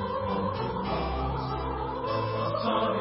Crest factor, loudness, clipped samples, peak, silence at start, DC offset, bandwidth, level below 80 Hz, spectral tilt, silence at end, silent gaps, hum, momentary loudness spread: 16 dB; -30 LUFS; under 0.1%; -14 dBFS; 0 s; under 0.1%; 5.8 kHz; -40 dBFS; -10.5 dB/octave; 0 s; none; none; 5 LU